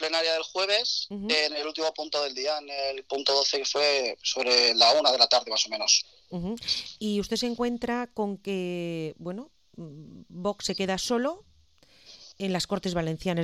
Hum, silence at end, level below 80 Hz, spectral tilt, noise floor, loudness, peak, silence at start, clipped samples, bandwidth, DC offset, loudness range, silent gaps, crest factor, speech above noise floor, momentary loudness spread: none; 0 s; -58 dBFS; -2.5 dB/octave; -61 dBFS; -26 LUFS; -4 dBFS; 0 s; under 0.1%; 14.5 kHz; under 0.1%; 11 LU; none; 24 dB; 33 dB; 15 LU